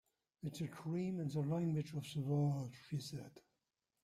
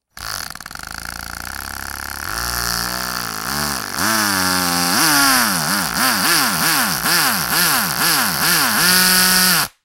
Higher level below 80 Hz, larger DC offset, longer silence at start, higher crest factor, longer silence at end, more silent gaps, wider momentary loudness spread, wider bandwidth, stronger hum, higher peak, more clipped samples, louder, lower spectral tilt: second, -76 dBFS vs -42 dBFS; neither; first, 0.45 s vs 0.15 s; about the same, 14 dB vs 18 dB; first, 0.65 s vs 0.15 s; neither; second, 12 LU vs 16 LU; second, 14.5 kHz vs 17 kHz; neither; second, -28 dBFS vs 0 dBFS; neither; second, -42 LUFS vs -15 LUFS; first, -7.5 dB/octave vs -1 dB/octave